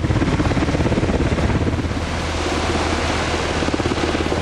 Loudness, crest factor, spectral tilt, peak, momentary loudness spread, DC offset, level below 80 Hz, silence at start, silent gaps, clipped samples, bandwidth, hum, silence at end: -20 LUFS; 12 dB; -5.5 dB/octave; -6 dBFS; 3 LU; under 0.1%; -26 dBFS; 0 s; none; under 0.1%; 11.5 kHz; none; 0 s